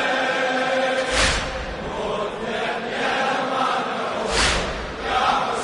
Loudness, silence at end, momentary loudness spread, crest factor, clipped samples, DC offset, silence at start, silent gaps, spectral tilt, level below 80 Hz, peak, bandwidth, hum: -22 LUFS; 0 s; 8 LU; 16 dB; under 0.1%; under 0.1%; 0 s; none; -3 dB/octave; -36 dBFS; -6 dBFS; 11 kHz; none